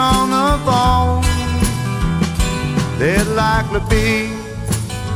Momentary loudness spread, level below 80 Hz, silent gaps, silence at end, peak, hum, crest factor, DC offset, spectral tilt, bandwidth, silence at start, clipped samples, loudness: 7 LU; -24 dBFS; none; 0 s; -2 dBFS; none; 14 dB; under 0.1%; -5 dB/octave; 17.5 kHz; 0 s; under 0.1%; -17 LUFS